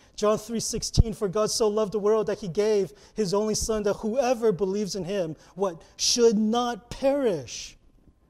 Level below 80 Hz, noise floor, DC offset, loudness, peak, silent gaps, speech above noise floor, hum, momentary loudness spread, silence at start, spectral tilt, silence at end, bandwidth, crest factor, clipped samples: -40 dBFS; -58 dBFS; under 0.1%; -26 LUFS; -4 dBFS; none; 33 dB; none; 8 LU; 0.2 s; -4.5 dB/octave; 0.6 s; 15 kHz; 20 dB; under 0.1%